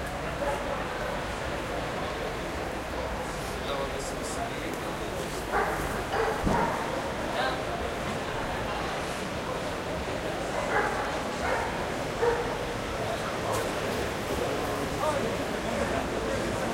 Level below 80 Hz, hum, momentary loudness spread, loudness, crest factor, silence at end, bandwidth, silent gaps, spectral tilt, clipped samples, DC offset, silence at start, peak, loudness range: -44 dBFS; none; 5 LU; -31 LUFS; 18 dB; 0 s; 16 kHz; none; -4.5 dB/octave; under 0.1%; under 0.1%; 0 s; -14 dBFS; 3 LU